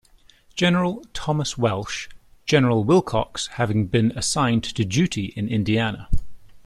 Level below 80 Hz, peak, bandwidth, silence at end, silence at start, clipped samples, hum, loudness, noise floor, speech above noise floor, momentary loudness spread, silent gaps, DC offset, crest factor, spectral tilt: -36 dBFS; -4 dBFS; 13 kHz; 0.05 s; 0.55 s; under 0.1%; none; -22 LUFS; -53 dBFS; 32 dB; 12 LU; none; under 0.1%; 18 dB; -5 dB/octave